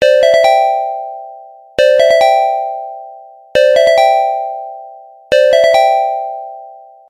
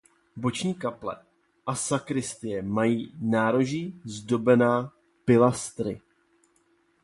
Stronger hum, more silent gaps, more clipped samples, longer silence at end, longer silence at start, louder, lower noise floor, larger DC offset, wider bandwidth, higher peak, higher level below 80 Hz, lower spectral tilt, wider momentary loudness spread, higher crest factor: neither; neither; neither; second, 0.3 s vs 1.05 s; second, 0 s vs 0.35 s; first, -11 LUFS vs -26 LUFS; second, -35 dBFS vs -67 dBFS; neither; first, 15.5 kHz vs 11.5 kHz; first, 0 dBFS vs -8 dBFS; first, -54 dBFS vs -62 dBFS; second, -1.5 dB/octave vs -5.5 dB/octave; first, 19 LU vs 16 LU; second, 12 dB vs 20 dB